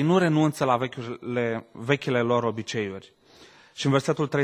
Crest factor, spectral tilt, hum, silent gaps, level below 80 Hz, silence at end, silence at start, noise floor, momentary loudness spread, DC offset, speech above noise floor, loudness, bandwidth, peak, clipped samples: 20 dB; -6 dB/octave; none; none; -64 dBFS; 0 s; 0 s; -53 dBFS; 11 LU; under 0.1%; 28 dB; -25 LUFS; 16 kHz; -6 dBFS; under 0.1%